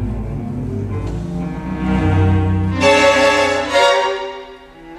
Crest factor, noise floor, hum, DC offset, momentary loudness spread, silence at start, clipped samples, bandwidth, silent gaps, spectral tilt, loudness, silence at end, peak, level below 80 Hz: 16 dB; -37 dBFS; none; under 0.1%; 13 LU; 0 s; under 0.1%; 12 kHz; none; -5.5 dB/octave; -16 LUFS; 0 s; 0 dBFS; -32 dBFS